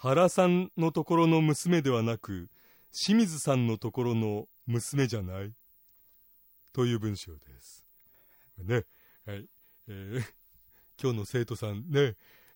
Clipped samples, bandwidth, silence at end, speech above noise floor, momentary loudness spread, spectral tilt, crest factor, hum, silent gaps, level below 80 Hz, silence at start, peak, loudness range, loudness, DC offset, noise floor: under 0.1%; 16.5 kHz; 0.4 s; 33 dB; 19 LU; -6 dB/octave; 18 dB; none; none; -66 dBFS; 0 s; -12 dBFS; 12 LU; -29 LUFS; under 0.1%; -62 dBFS